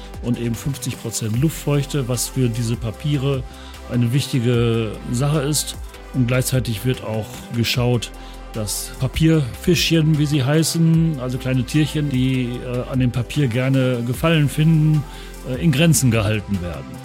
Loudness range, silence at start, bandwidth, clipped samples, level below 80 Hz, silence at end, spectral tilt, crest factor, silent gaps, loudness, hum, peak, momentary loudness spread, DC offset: 4 LU; 0 s; 17 kHz; under 0.1%; -36 dBFS; 0 s; -5.5 dB/octave; 14 dB; none; -20 LUFS; none; -4 dBFS; 10 LU; under 0.1%